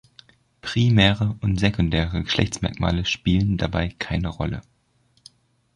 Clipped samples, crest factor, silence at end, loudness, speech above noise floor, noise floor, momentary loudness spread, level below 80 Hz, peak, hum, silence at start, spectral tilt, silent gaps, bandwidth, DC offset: under 0.1%; 20 dB; 1.15 s; -22 LUFS; 42 dB; -64 dBFS; 10 LU; -36 dBFS; -4 dBFS; none; 0.65 s; -6 dB/octave; none; 10.5 kHz; under 0.1%